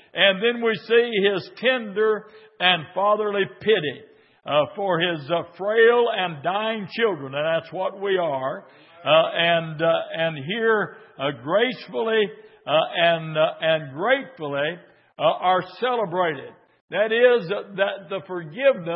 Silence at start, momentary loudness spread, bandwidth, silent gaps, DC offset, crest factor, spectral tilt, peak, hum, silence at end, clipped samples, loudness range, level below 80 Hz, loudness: 0.15 s; 11 LU; 5.8 kHz; 16.81-16.88 s; under 0.1%; 20 dB; -9.5 dB/octave; -4 dBFS; none; 0 s; under 0.1%; 2 LU; -74 dBFS; -22 LUFS